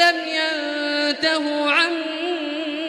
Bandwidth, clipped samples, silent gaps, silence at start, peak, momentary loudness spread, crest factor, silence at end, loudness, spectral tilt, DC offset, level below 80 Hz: 14.5 kHz; under 0.1%; none; 0 s; -4 dBFS; 7 LU; 18 dB; 0 s; -20 LUFS; -1.5 dB/octave; under 0.1%; -76 dBFS